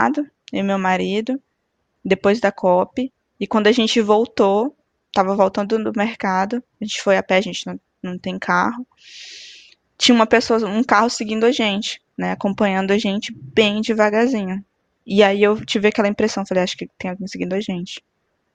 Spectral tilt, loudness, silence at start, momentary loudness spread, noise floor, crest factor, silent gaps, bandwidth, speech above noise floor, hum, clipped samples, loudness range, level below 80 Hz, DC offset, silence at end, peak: -4.5 dB/octave; -19 LUFS; 0 s; 13 LU; -71 dBFS; 18 dB; none; 9.4 kHz; 53 dB; none; under 0.1%; 3 LU; -58 dBFS; under 0.1%; 0.55 s; 0 dBFS